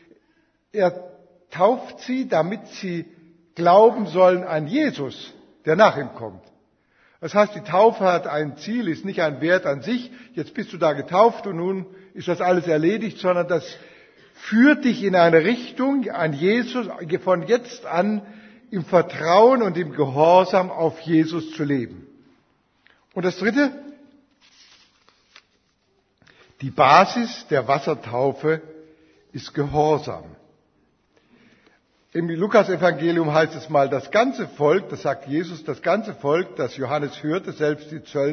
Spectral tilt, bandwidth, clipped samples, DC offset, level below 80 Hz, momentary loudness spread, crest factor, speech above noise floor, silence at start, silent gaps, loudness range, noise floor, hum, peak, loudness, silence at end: -6.5 dB/octave; 6.6 kHz; under 0.1%; under 0.1%; -62 dBFS; 16 LU; 22 dB; 46 dB; 0.75 s; none; 8 LU; -66 dBFS; none; 0 dBFS; -21 LUFS; 0 s